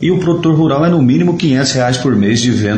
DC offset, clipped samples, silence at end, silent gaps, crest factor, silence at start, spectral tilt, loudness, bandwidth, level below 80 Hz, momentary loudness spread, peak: under 0.1%; under 0.1%; 0 s; none; 10 dB; 0 s; -6 dB/octave; -12 LUFS; 9.6 kHz; -44 dBFS; 2 LU; -2 dBFS